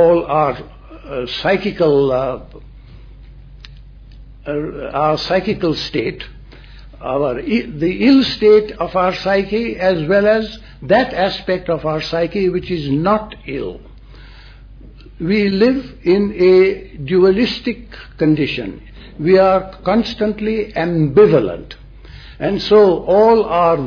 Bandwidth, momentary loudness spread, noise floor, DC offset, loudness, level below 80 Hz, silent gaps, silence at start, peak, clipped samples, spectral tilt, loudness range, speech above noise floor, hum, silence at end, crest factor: 5.4 kHz; 14 LU; -38 dBFS; under 0.1%; -15 LUFS; -38 dBFS; none; 0 s; 0 dBFS; under 0.1%; -7.5 dB/octave; 6 LU; 23 dB; none; 0 s; 16 dB